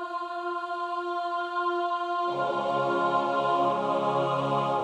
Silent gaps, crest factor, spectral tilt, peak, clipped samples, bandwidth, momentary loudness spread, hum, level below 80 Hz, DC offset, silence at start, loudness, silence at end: none; 14 dB; -6.5 dB/octave; -14 dBFS; under 0.1%; 10.5 kHz; 6 LU; none; -72 dBFS; under 0.1%; 0 s; -28 LUFS; 0 s